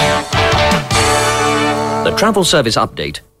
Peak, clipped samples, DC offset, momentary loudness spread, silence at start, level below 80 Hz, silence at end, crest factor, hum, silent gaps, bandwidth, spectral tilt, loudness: -2 dBFS; under 0.1%; under 0.1%; 4 LU; 0 s; -32 dBFS; 0.2 s; 12 dB; none; none; 16 kHz; -3.5 dB/octave; -13 LUFS